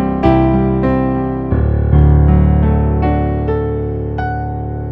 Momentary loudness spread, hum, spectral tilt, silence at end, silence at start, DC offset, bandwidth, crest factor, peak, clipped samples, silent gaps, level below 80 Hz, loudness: 9 LU; none; -11.5 dB/octave; 0 s; 0 s; under 0.1%; 4.3 kHz; 12 dB; 0 dBFS; under 0.1%; none; -18 dBFS; -14 LUFS